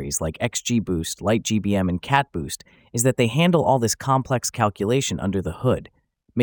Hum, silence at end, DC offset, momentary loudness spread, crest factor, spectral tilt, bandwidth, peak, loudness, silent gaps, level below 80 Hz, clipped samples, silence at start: none; 0 s; under 0.1%; 9 LU; 20 dB; -5 dB/octave; over 20 kHz; -2 dBFS; -22 LUFS; none; -48 dBFS; under 0.1%; 0 s